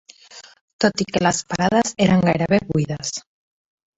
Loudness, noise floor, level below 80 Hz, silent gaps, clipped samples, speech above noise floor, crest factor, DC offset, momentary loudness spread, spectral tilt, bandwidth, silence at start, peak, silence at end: -20 LUFS; -45 dBFS; -50 dBFS; 0.61-0.79 s; under 0.1%; 26 dB; 18 dB; under 0.1%; 9 LU; -5 dB/octave; 8.2 kHz; 0.35 s; -2 dBFS; 0.8 s